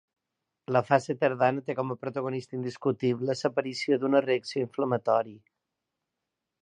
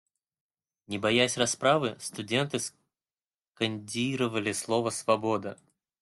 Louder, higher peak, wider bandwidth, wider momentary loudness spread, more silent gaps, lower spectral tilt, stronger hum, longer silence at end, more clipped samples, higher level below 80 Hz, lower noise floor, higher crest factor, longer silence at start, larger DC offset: about the same, -28 LUFS vs -29 LUFS; first, -6 dBFS vs -10 dBFS; second, 10 kHz vs 12.5 kHz; about the same, 8 LU vs 9 LU; neither; first, -6.5 dB/octave vs -3.5 dB/octave; neither; first, 1.25 s vs 0.45 s; neither; second, -76 dBFS vs -70 dBFS; second, -86 dBFS vs under -90 dBFS; about the same, 22 dB vs 20 dB; second, 0.7 s vs 0.9 s; neither